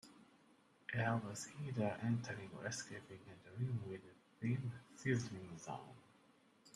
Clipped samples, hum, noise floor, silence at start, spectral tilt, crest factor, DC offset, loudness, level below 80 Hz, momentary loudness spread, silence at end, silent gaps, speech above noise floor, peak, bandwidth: under 0.1%; none; -71 dBFS; 0.05 s; -6 dB/octave; 20 dB; under 0.1%; -44 LUFS; -78 dBFS; 16 LU; 0.05 s; none; 27 dB; -26 dBFS; 12.5 kHz